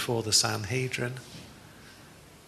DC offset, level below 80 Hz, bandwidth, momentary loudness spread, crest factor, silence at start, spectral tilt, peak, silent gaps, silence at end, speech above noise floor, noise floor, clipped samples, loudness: under 0.1%; -62 dBFS; 13.5 kHz; 24 LU; 22 dB; 0 s; -2.5 dB/octave; -10 dBFS; none; 0.1 s; 23 dB; -52 dBFS; under 0.1%; -27 LUFS